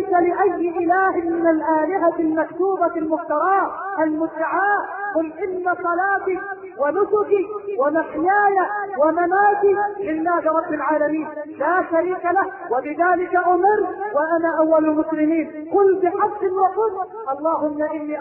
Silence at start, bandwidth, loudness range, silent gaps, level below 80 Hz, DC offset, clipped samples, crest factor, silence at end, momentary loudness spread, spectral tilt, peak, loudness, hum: 0 s; 3.1 kHz; 3 LU; none; -60 dBFS; under 0.1%; under 0.1%; 14 dB; 0 s; 7 LU; -10.5 dB/octave; -6 dBFS; -20 LUFS; none